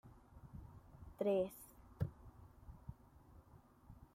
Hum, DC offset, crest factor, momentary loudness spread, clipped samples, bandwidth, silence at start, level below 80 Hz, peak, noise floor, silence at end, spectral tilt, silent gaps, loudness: none; under 0.1%; 20 dB; 26 LU; under 0.1%; 16 kHz; 0.05 s; -62 dBFS; -26 dBFS; -65 dBFS; 0.1 s; -7.5 dB/octave; none; -42 LUFS